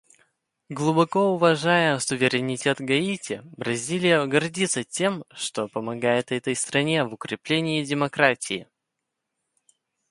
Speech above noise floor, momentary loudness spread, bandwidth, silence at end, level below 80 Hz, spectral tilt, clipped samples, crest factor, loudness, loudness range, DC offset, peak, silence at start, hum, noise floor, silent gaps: 58 dB; 10 LU; 11.5 kHz; 1.45 s; -68 dBFS; -4 dB/octave; under 0.1%; 22 dB; -24 LUFS; 3 LU; under 0.1%; -4 dBFS; 0.7 s; none; -82 dBFS; none